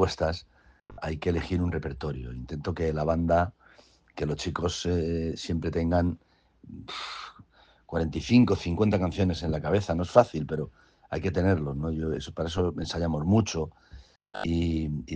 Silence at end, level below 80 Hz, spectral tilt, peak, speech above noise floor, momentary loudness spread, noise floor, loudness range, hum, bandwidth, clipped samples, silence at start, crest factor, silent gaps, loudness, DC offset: 0 s; -46 dBFS; -6.5 dB/octave; -4 dBFS; 31 dB; 15 LU; -58 dBFS; 5 LU; none; 9.4 kHz; under 0.1%; 0 s; 24 dB; none; -28 LUFS; under 0.1%